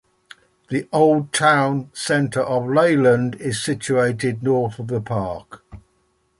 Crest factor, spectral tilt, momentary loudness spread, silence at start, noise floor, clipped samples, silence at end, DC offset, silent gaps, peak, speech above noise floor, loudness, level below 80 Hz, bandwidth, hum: 18 dB; -5.5 dB/octave; 10 LU; 0.7 s; -65 dBFS; under 0.1%; 0.6 s; under 0.1%; none; -2 dBFS; 46 dB; -19 LUFS; -54 dBFS; 11.5 kHz; none